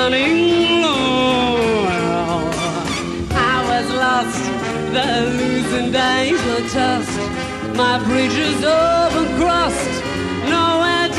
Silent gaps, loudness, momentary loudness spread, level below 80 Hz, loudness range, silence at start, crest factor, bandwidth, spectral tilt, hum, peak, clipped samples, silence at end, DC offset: none; -17 LUFS; 7 LU; -38 dBFS; 2 LU; 0 s; 12 dB; 13 kHz; -4.5 dB/octave; none; -4 dBFS; under 0.1%; 0 s; under 0.1%